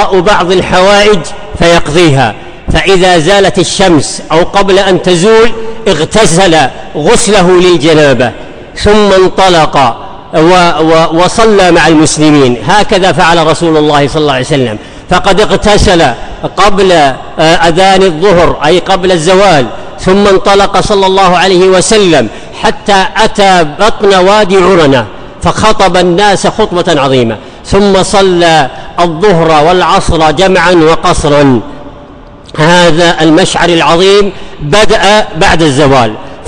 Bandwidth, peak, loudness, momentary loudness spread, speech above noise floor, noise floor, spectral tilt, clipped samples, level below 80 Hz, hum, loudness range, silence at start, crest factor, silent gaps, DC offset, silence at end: 10.5 kHz; 0 dBFS; -6 LUFS; 7 LU; 24 dB; -29 dBFS; -4.5 dB/octave; 0.9%; -24 dBFS; none; 2 LU; 0 s; 6 dB; none; under 0.1%; 0 s